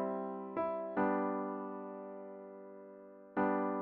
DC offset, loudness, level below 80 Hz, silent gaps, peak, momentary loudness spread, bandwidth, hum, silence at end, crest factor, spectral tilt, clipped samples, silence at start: under 0.1%; -38 LUFS; -76 dBFS; none; -22 dBFS; 18 LU; 4.5 kHz; none; 0 s; 16 dB; -7.5 dB/octave; under 0.1%; 0 s